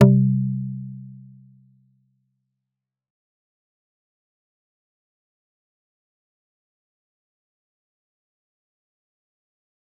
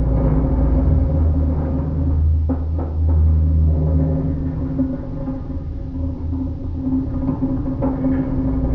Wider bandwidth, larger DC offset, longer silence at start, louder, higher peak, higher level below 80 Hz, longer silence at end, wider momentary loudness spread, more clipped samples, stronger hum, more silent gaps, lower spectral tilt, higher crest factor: first, 3 kHz vs 2.3 kHz; neither; about the same, 0 s vs 0 s; about the same, -21 LUFS vs -20 LUFS; first, -2 dBFS vs -6 dBFS; second, -70 dBFS vs -22 dBFS; first, 8.85 s vs 0 s; first, 25 LU vs 9 LU; neither; neither; neither; second, -10.5 dB/octave vs -12 dB/octave; first, 26 dB vs 12 dB